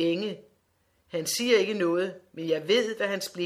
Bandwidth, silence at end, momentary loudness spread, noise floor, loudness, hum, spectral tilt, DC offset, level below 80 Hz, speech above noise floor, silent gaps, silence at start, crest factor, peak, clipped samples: 16 kHz; 0 s; 13 LU; -70 dBFS; -27 LUFS; none; -3.5 dB/octave; under 0.1%; -76 dBFS; 43 dB; none; 0 s; 18 dB; -10 dBFS; under 0.1%